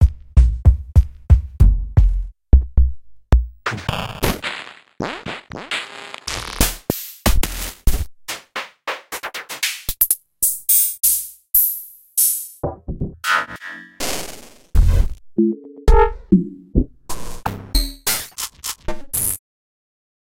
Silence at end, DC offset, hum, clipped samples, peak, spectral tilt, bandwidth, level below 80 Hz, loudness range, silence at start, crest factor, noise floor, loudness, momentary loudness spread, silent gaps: 1 s; under 0.1%; none; under 0.1%; 0 dBFS; -4 dB/octave; 17 kHz; -22 dBFS; 7 LU; 0 s; 18 dB; -38 dBFS; -20 LUFS; 14 LU; none